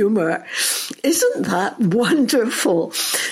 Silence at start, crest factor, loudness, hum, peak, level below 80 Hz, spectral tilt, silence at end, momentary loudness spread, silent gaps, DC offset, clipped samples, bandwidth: 0 s; 12 dB; -18 LUFS; none; -6 dBFS; -66 dBFS; -3.5 dB/octave; 0 s; 4 LU; none; under 0.1%; under 0.1%; 16.5 kHz